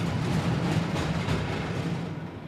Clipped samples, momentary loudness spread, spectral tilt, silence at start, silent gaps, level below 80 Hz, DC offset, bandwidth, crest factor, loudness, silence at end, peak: under 0.1%; 5 LU; -6.5 dB/octave; 0 s; none; -44 dBFS; under 0.1%; 13 kHz; 14 dB; -29 LUFS; 0 s; -16 dBFS